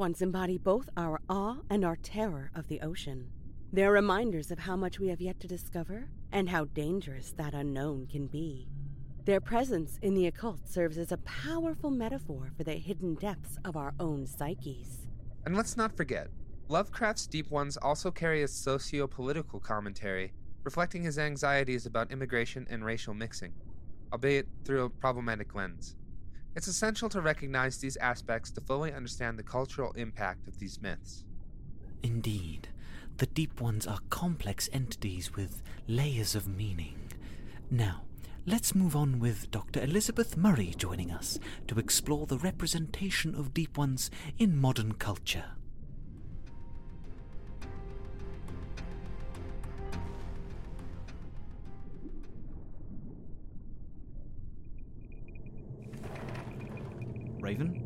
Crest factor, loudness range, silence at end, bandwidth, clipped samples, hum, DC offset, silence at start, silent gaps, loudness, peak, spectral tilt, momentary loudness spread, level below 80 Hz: 20 dB; 14 LU; 0 s; 16.5 kHz; under 0.1%; none; under 0.1%; 0 s; none; -34 LUFS; -14 dBFS; -5 dB/octave; 19 LU; -46 dBFS